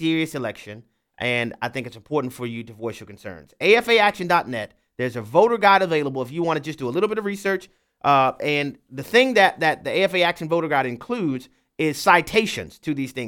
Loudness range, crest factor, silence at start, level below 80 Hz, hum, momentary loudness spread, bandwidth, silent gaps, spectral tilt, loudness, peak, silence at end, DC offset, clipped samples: 4 LU; 20 dB; 0 s; -60 dBFS; none; 16 LU; 17.5 kHz; none; -5 dB/octave; -21 LUFS; -2 dBFS; 0 s; under 0.1%; under 0.1%